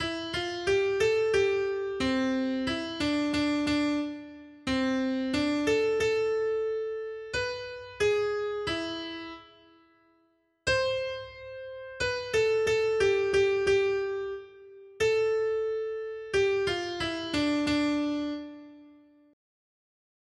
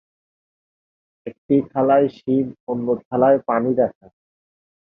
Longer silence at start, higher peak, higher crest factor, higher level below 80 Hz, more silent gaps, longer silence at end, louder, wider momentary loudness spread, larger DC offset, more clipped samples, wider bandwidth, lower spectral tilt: second, 0 s vs 1.25 s; second, -14 dBFS vs -4 dBFS; about the same, 16 dB vs 18 dB; first, -56 dBFS vs -62 dBFS; second, none vs 1.38-1.49 s, 2.60-2.67 s, 3.05-3.11 s; first, 1.45 s vs 0.95 s; second, -28 LUFS vs -19 LUFS; first, 13 LU vs 10 LU; neither; neither; first, 11.5 kHz vs 5.2 kHz; second, -4.5 dB/octave vs -10.5 dB/octave